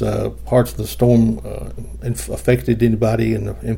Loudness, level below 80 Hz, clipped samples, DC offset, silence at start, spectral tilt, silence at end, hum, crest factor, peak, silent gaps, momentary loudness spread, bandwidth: -18 LUFS; -32 dBFS; under 0.1%; under 0.1%; 0 s; -7 dB/octave; 0 s; none; 16 dB; -2 dBFS; none; 13 LU; 17 kHz